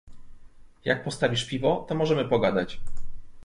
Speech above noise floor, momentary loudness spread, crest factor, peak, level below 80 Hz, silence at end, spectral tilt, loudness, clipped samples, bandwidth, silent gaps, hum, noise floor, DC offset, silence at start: 21 dB; 16 LU; 18 dB; -8 dBFS; -44 dBFS; 0 s; -5.5 dB/octave; -26 LUFS; under 0.1%; 11.5 kHz; none; none; -46 dBFS; under 0.1%; 0.05 s